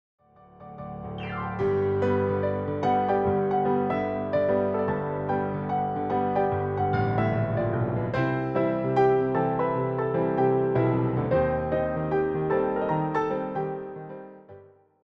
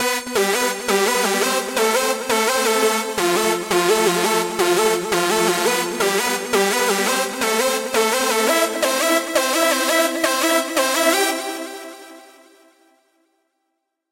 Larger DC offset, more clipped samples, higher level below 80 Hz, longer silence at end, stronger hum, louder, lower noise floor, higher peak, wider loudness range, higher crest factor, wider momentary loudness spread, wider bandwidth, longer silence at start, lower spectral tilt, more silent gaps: neither; neither; first, -52 dBFS vs -62 dBFS; second, 0.45 s vs 1.85 s; neither; second, -26 LUFS vs -18 LUFS; second, -51 dBFS vs -75 dBFS; second, -12 dBFS vs -2 dBFS; about the same, 2 LU vs 3 LU; about the same, 14 dB vs 18 dB; first, 9 LU vs 3 LU; second, 6.2 kHz vs 16 kHz; first, 0.6 s vs 0 s; first, -10 dB/octave vs -2 dB/octave; neither